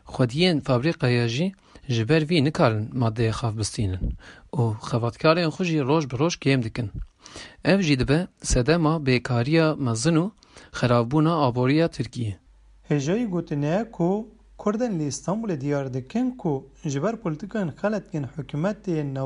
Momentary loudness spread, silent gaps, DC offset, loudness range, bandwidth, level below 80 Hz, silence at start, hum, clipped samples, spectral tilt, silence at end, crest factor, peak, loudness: 11 LU; none; under 0.1%; 5 LU; 11.5 kHz; -42 dBFS; 0.05 s; none; under 0.1%; -6 dB/octave; 0 s; 18 dB; -6 dBFS; -24 LUFS